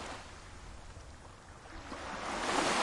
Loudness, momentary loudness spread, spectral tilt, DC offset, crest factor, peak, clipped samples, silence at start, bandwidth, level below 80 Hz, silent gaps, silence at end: -37 LUFS; 20 LU; -2.5 dB/octave; under 0.1%; 20 dB; -20 dBFS; under 0.1%; 0 s; 11.5 kHz; -54 dBFS; none; 0 s